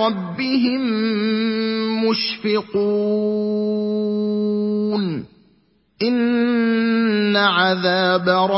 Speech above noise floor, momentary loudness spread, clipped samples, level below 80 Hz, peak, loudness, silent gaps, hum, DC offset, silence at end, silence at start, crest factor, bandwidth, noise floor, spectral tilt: 41 dB; 5 LU; under 0.1%; -62 dBFS; -2 dBFS; -19 LUFS; none; none; under 0.1%; 0 s; 0 s; 16 dB; 5.8 kHz; -59 dBFS; -9 dB/octave